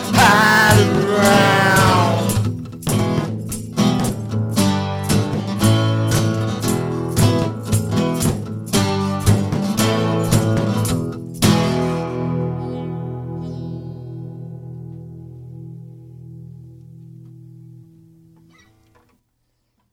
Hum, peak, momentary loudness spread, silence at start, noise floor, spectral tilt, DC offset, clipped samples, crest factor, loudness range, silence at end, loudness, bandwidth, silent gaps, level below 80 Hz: none; 0 dBFS; 21 LU; 0 s; -68 dBFS; -5 dB/octave; under 0.1%; under 0.1%; 18 dB; 19 LU; 2.15 s; -17 LUFS; over 20 kHz; none; -40 dBFS